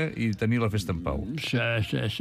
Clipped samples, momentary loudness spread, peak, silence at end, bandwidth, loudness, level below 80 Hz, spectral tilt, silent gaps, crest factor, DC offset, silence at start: under 0.1%; 5 LU; -14 dBFS; 0 s; 15 kHz; -28 LUFS; -44 dBFS; -6 dB/octave; none; 12 dB; under 0.1%; 0 s